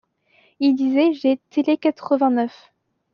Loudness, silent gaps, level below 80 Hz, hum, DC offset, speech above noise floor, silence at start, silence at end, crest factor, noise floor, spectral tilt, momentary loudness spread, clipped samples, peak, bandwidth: -20 LUFS; none; -74 dBFS; none; under 0.1%; 40 dB; 0.6 s; 0.65 s; 14 dB; -59 dBFS; -6 dB/octave; 4 LU; under 0.1%; -6 dBFS; 6.4 kHz